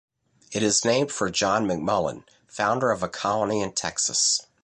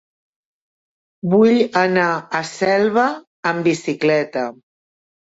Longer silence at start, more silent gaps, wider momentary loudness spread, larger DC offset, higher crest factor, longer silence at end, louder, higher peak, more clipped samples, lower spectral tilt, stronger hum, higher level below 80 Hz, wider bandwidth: second, 0.5 s vs 1.25 s; second, none vs 3.27-3.43 s; second, 6 LU vs 10 LU; neither; about the same, 16 dB vs 16 dB; second, 0.2 s vs 0.85 s; second, -24 LUFS vs -18 LUFS; second, -8 dBFS vs -4 dBFS; neither; second, -2.5 dB/octave vs -5.5 dB/octave; neither; first, -58 dBFS vs -64 dBFS; first, 11.5 kHz vs 8 kHz